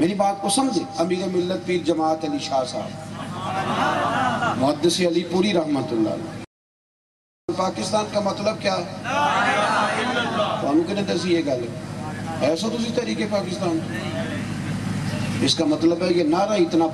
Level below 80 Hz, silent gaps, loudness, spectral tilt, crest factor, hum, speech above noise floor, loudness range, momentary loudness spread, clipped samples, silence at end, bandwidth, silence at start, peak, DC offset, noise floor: -54 dBFS; 6.47-7.48 s; -22 LUFS; -5 dB/octave; 16 dB; none; over 68 dB; 3 LU; 8 LU; under 0.1%; 0 s; 12.5 kHz; 0 s; -6 dBFS; under 0.1%; under -90 dBFS